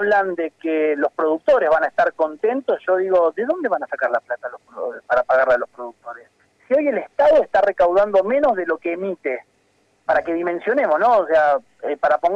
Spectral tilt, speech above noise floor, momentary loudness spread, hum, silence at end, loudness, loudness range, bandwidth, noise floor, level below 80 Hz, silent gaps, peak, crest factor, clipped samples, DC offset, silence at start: -6 dB/octave; 43 dB; 13 LU; none; 0 s; -19 LUFS; 3 LU; 7.2 kHz; -62 dBFS; -58 dBFS; none; -8 dBFS; 10 dB; under 0.1%; under 0.1%; 0 s